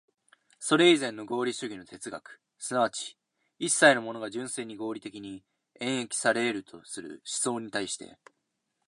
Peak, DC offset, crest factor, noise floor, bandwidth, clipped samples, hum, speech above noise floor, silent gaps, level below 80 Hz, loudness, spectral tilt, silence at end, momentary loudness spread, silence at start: -6 dBFS; under 0.1%; 24 dB; -80 dBFS; 11.5 kHz; under 0.1%; none; 51 dB; none; -76 dBFS; -28 LUFS; -2.5 dB/octave; 0.8 s; 20 LU; 0.6 s